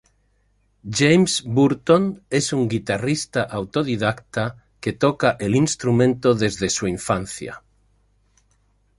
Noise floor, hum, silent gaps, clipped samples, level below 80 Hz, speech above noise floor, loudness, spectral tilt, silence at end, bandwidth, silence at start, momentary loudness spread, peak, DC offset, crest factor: -63 dBFS; 50 Hz at -50 dBFS; none; under 0.1%; -50 dBFS; 43 dB; -20 LUFS; -5 dB/octave; 1.4 s; 11.5 kHz; 0.85 s; 12 LU; -2 dBFS; under 0.1%; 18 dB